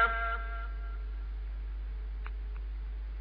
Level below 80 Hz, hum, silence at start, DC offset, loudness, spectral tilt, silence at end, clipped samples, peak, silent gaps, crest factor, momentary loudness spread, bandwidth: -36 dBFS; none; 0 s; under 0.1%; -39 LUFS; -3.5 dB/octave; 0 s; under 0.1%; -16 dBFS; none; 18 dB; 7 LU; 5 kHz